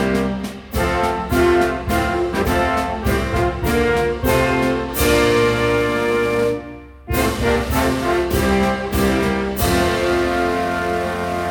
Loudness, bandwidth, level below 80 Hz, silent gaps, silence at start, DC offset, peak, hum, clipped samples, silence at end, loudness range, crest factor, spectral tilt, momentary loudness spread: -18 LUFS; over 20 kHz; -30 dBFS; none; 0 s; under 0.1%; -4 dBFS; none; under 0.1%; 0 s; 2 LU; 14 dB; -5.5 dB/octave; 6 LU